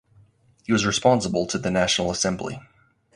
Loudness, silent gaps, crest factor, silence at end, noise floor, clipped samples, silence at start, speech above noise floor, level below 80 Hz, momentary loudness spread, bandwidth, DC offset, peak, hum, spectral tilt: -22 LUFS; none; 20 dB; 0.55 s; -57 dBFS; under 0.1%; 0.7 s; 34 dB; -50 dBFS; 14 LU; 11.5 kHz; under 0.1%; -4 dBFS; none; -4 dB/octave